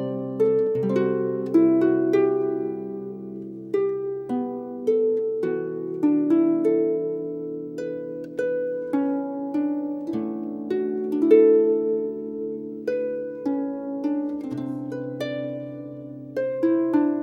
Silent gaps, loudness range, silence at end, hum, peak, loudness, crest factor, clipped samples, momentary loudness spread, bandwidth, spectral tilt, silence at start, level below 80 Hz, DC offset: none; 6 LU; 0 s; none; -4 dBFS; -24 LUFS; 20 dB; under 0.1%; 12 LU; 6.4 kHz; -9 dB/octave; 0 s; -70 dBFS; under 0.1%